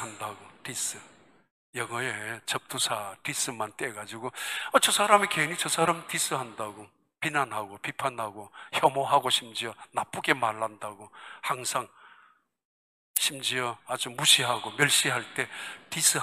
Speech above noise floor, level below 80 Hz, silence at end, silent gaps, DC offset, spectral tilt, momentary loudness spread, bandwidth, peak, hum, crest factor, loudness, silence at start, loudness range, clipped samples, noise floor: 33 dB; -76 dBFS; 0 s; 1.51-1.73 s, 12.65-13.14 s; under 0.1%; -1.5 dB/octave; 16 LU; 15.5 kHz; -4 dBFS; none; 26 dB; -27 LUFS; 0 s; 7 LU; under 0.1%; -62 dBFS